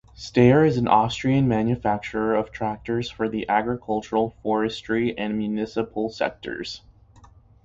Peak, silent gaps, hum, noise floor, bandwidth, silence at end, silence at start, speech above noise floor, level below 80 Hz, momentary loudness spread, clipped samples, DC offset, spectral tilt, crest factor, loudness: -4 dBFS; none; none; -51 dBFS; 7.8 kHz; 0.85 s; 0.2 s; 29 dB; -50 dBFS; 10 LU; under 0.1%; under 0.1%; -7 dB/octave; 20 dB; -23 LUFS